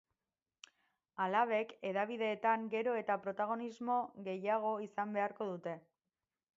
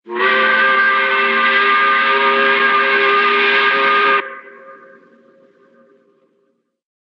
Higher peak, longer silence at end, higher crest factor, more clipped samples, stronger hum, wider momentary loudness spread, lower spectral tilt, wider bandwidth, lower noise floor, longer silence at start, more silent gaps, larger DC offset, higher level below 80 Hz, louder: second, -20 dBFS vs -2 dBFS; second, 0.75 s vs 2.35 s; first, 20 dB vs 12 dB; neither; neither; first, 8 LU vs 2 LU; about the same, -3.5 dB/octave vs -4 dB/octave; first, 7.6 kHz vs 6.4 kHz; first, under -90 dBFS vs -64 dBFS; first, 1.15 s vs 0.05 s; neither; neither; about the same, -90 dBFS vs -88 dBFS; second, -37 LUFS vs -12 LUFS